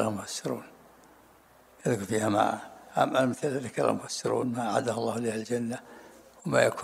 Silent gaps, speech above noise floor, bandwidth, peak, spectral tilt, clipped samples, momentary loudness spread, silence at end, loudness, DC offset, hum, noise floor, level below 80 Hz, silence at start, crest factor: none; 30 dB; 16 kHz; -6 dBFS; -5 dB/octave; under 0.1%; 12 LU; 0 s; -29 LUFS; under 0.1%; none; -58 dBFS; -70 dBFS; 0 s; 22 dB